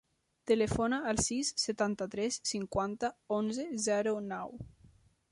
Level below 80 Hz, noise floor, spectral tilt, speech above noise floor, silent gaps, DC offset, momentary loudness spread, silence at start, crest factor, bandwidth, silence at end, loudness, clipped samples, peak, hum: -56 dBFS; -63 dBFS; -3.5 dB/octave; 30 dB; none; under 0.1%; 10 LU; 0.45 s; 18 dB; 11.5 kHz; 0.65 s; -33 LUFS; under 0.1%; -16 dBFS; none